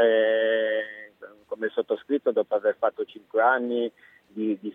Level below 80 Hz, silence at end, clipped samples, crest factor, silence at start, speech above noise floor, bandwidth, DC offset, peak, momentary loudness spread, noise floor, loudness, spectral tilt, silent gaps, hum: -80 dBFS; 0 s; under 0.1%; 16 dB; 0 s; 22 dB; 3.9 kHz; under 0.1%; -8 dBFS; 15 LU; -47 dBFS; -25 LUFS; -7 dB/octave; none; none